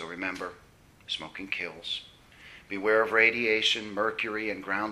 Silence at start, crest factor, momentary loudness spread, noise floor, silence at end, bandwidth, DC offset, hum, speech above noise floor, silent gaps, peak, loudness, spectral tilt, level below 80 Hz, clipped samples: 0 s; 22 dB; 14 LU; -52 dBFS; 0 s; 13.5 kHz; under 0.1%; none; 23 dB; none; -8 dBFS; -28 LUFS; -3 dB/octave; -64 dBFS; under 0.1%